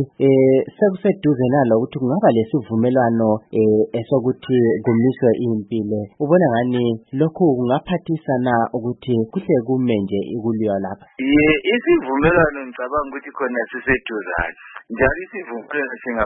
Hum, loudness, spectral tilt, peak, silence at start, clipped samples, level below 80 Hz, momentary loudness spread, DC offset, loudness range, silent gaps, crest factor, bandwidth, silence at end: none; -19 LUFS; -12.5 dB/octave; -2 dBFS; 0 s; under 0.1%; -44 dBFS; 9 LU; under 0.1%; 3 LU; none; 16 dB; 4 kHz; 0 s